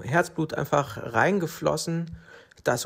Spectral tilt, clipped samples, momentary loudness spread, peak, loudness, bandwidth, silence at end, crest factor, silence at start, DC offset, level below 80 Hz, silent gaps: -5 dB/octave; under 0.1%; 9 LU; -8 dBFS; -26 LUFS; 16 kHz; 0 s; 18 dB; 0 s; under 0.1%; -58 dBFS; none